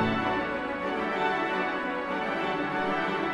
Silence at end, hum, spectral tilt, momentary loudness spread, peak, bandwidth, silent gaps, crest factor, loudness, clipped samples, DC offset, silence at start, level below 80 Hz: 0 s; none; -6 dB/octave; 3 LU; -14 dBFS; 12 kHz; none; 14 dB; -29 LUFS; under 0.1%; under 0.1%; 0 s; -56 dBFS